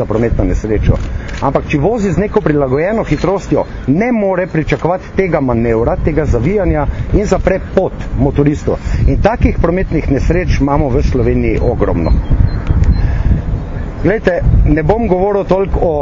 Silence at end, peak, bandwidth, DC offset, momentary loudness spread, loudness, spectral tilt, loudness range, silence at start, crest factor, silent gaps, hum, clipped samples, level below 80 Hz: 0 s; 0 dBFS; 7.6 kHz; under 0.1%; 3 LU; -14 LUFS; -8.5 dB/octave; 1 LU; 0 s; 12 dB; none; none; 0.1%; -18 dBFS